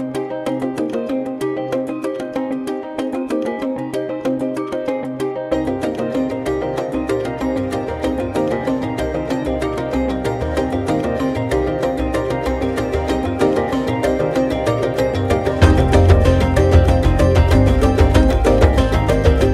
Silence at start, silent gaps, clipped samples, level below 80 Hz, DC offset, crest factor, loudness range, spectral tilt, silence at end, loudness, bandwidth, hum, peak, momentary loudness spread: 0 s; none; under 0.1%; -24 dBFS; under 0.1%; 16 dB; 8 LU; -7.5 dB/octave; 0 s; -18 LUFS; 13.5 kHz; none; 0 dBFS; 9 LU